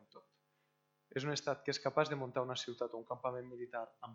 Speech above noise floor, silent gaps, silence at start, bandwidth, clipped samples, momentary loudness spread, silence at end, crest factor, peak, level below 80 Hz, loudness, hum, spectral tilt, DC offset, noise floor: 40 dB; none; 0.15 s; 8 kHz; under 0.1%; 10 LU; 0 s; 24 dB; -18 dBFS; -84 dBFS; -40 LUFS; none; -4.5 dB/octave; under 0.1%; -80 dBFS